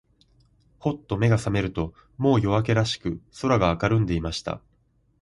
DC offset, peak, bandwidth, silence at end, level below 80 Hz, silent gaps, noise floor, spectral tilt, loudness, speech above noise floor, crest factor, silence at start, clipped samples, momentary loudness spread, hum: under 0.1%; -6 dBFS; 11.5 kHz; 0.65 s; -42 dBFS; none; -65 dBFS; -6.5 dB/octave; -25 LUFS; 41 dB; 18 dB; 0.85 s; under 0.1%; 10 LU; none